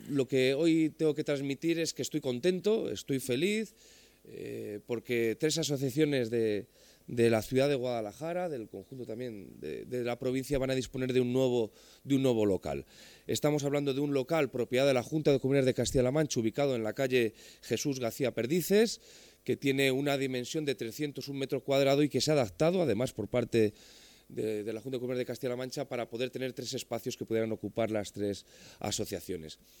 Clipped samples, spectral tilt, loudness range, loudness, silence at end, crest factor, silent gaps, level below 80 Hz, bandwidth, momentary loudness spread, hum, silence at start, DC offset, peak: under 0.1%; -5 dB/octave; 6 LU; -31 LUFS; 0.25 s; 18 dB; none; -60 dBFS; 19 kHz; 12 LU; none; 0 s; under 0.1%; -14 dBFS